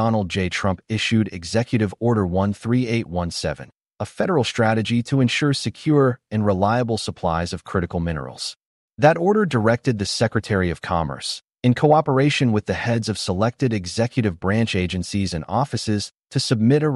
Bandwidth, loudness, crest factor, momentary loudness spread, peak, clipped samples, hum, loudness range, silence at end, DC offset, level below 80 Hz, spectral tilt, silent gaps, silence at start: 11.5 kHz; -21 LUFS; 18 dB; 8 LU; -4 dBFS; under 0.1%; none; 2 LU; 0 s; under 0.1%; -46 dBFS; -6 dB/octave; 8.66-8.89 s; 0 s